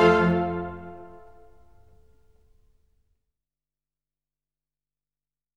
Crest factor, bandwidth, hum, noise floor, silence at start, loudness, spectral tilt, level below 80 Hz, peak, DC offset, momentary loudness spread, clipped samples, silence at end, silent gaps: 22 dB; 8 kHz; 50 Hz at -80 dBFS; under -90 dBFS; 0 s; -24 LUFS; -7.5 dB/octave; -54 dBFS; -6 dBFS; under 0.1%; 25 LU; under 0.1%; 4.5 s; none